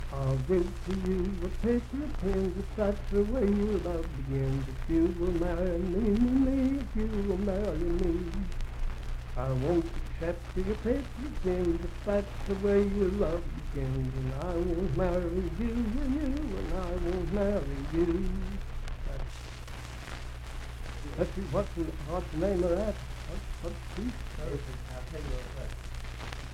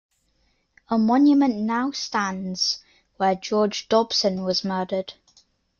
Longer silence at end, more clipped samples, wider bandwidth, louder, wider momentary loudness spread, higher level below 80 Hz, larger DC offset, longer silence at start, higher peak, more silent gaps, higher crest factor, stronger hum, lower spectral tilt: second, 0 s vs 0.65 s; neither; first, 14 kHz vs 7.2 kHz; second, -32 LUFS vs -22 LUFS; first, 13 LU vs 9 LU; first, -36 dBFS vs -64 dBFS; neither; second, 0 s vs 0.9 s; second, -14 dBFS vs -6 dBFS; neither; about the same, 16 dB vs 18 dB; neither; first, -7.5 dB/octave vs -4.5 dB/octave